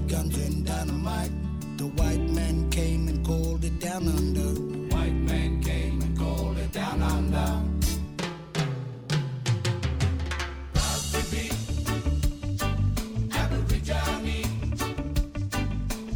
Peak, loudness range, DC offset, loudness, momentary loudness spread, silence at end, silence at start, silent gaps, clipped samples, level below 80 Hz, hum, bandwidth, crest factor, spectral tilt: -12 dBFS; 1 LU; under 0.1%; -28 LUFS; 4 LU; 0 s; 0 s; none; under 0.1%; -30 dBFS; none; 19.5 kHz; 16 dB; -5.5 dB/octave